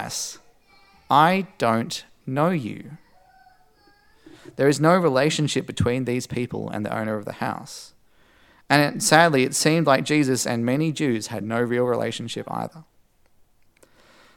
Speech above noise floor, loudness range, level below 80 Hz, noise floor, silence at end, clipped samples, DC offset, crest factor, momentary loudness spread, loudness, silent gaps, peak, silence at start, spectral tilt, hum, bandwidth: 37 dB; 7 LU; -60 dBFS; -58 dBFS; 1.55 s; under 0.1%; under 0.1%; 22 dB; 14 LU; -22 LUFS; none; 0 dBFS; 0 s; -4.5 dB/octave; none; 18 kHz